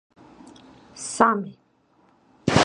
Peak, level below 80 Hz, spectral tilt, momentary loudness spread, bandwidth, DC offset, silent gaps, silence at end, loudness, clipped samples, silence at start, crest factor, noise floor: 0 dBFS; -50 dBFS; -4.5 dB/octave; 19 LU; 11 kHz; under 0.1%; none; 0 s; -23 LUFS; under 0.1%; 0.95 s; 26 dB; -62 dBFS